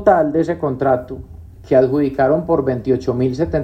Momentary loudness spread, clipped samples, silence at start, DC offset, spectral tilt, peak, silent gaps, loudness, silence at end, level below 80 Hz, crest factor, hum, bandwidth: 6 LU; under 0.1%; 0 s; under 0.1%; -9 dB/octave; 0 dBFS; none; -17 LUFS; 0 s; -40 dBFS; 16 dB; none; 8.2 kHz